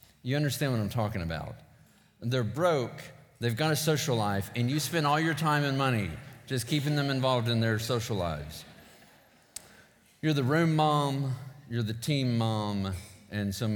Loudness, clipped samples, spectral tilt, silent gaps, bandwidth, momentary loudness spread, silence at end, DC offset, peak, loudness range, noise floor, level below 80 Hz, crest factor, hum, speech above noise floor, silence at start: -29 LUFS; under 0.1%; -5.5 dB/octave; none; 19 kHz; 13 LU; 0 s; under 0.1%; -12 dBFS; 4 LU; -60 dBFS; -58 dBFS; 18 dB; none; 31 dB; 0.25 s